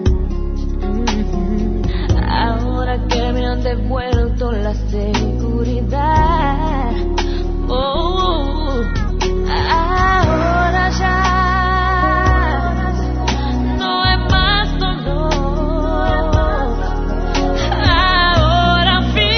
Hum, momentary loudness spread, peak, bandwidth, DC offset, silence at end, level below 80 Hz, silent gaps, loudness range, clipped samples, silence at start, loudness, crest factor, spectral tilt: none; 7 LU; 0 dBFS; 6.6 kHz; 0.1%; 0 s; -18 dBFS; none; 4 LU; under 0.1%; 0 s; -16 LUFS; 14 dB; -6 dB/octave